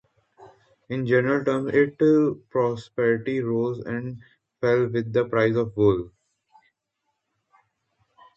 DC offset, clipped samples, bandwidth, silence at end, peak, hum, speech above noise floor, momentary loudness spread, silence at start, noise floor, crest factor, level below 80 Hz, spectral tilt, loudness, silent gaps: under 0.1%; under 0.1%; 8.4 kHz; 2.3 s; -6 dBFS; none; 56 dB; 11 LU; 0.4 s; -78 dBFS; 18 dB; -58 dBFS; -8.5 dB/octave; -23 LUFS; none